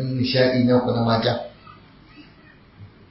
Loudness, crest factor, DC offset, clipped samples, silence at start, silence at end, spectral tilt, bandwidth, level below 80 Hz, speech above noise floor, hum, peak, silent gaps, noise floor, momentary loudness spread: -20 LUFS; 18 dB; under 0.1%; under 0.1%; 0 s; 0.25 s; -10.5 dB/octave; 5.8 kHz; -52 dBFS; 30 dB; none; -4 dBFS; none; -49 dBFS; 10 LU